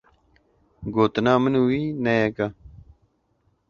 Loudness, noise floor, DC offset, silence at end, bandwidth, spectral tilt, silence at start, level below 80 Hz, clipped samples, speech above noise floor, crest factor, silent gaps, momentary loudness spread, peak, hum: -22 LUFS; -67 dBFS; under 0.1%; 1 s; 7 kHz; -7.5 dB/octave; 0.8 s; -52 dBFS; under 0.1%; 46 dB; 20 dB; none; 10 LU; -4 dBFS; none